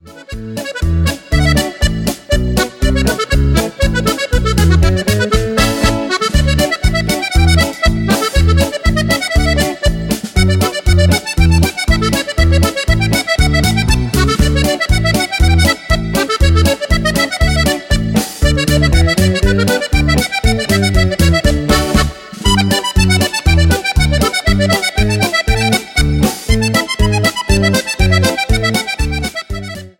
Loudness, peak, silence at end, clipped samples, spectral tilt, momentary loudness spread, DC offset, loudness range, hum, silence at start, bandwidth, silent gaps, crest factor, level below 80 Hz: -13 LUFS; 0 dBFS; 0.1 s; under 0.1%; -5 dB/octave; 4 LU; under 0.1%; 1 LU; none; 0.05 s; 17 kHz; none; 12 dB; -18 dBFS